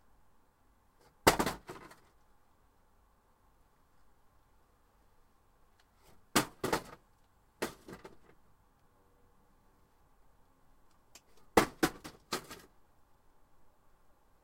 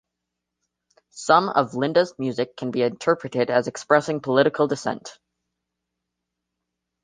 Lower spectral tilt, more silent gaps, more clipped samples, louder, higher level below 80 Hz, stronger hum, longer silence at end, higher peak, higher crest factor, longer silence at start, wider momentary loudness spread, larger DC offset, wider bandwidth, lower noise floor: second, -3.5 dB/octave vs -5 dB/octave; neither; neither; second, -33 LUFS vs -22 LUFS; first, -60 dBFS vs -68 dBFS; neither; about the same, 1.9 s vs 1.9 s; second, -8 dBFS vs -2 dBFS; first, 32 dB vs 22 dB; about the same, 1.25 s vs 1.15 s; first, 23 LU vs 9 LU; neither; first, 16 kHz vs 9.8 kHz; second, -68 dBFS vs -83 dBFS